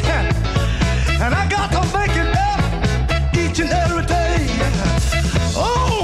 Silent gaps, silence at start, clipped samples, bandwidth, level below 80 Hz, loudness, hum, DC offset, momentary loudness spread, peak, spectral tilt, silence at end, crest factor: none; 0 s; under 0.1%; 13.5 kHz; -22 dBFS; -18 LUFS; none; under 0.1%; 1 LU; -6 dBFS; -5 dB/octave; 0 s; 12 dB